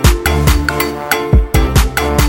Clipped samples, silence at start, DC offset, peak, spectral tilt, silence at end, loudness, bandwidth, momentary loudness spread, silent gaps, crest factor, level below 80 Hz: under 0.1%; 0 s; under 0.1%; 0 dBFS; -5 dB/octave; 0 s; -13 LUFS; 17 kHz; 4 LU; none; 12 dB; -14 dBFS